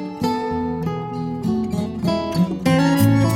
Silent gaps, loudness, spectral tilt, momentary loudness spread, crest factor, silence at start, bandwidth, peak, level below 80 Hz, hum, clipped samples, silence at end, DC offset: none; -21 LUFS; -7 dB/octave; 9 LU; 16 dB; 0 s; 16.5 kHz; -4 dBFS; -44 dBFS; none; under 0.1%; 0 s; under 0.1%